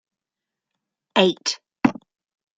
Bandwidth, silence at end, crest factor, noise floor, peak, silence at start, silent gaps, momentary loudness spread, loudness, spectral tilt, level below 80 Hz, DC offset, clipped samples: 9.2 kHz; 0.65 s; 24 dB; -87 dBFS; -2 dBFS; 1.15 s; none; 8 LU; -22 LUFS; -4 dB/octave; -62 dBFS; under 0.1%; under 0.1%